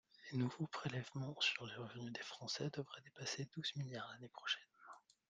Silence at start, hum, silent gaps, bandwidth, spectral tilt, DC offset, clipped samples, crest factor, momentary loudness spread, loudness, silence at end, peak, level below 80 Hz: 0.2 s; none; none; 9.6 kHz; -4 dB/octave; under 0.1%; under 0.1%; 22 dB; 12 LU; -45 LUFS; 0.3 s; -24 dBFS; -82 dBFS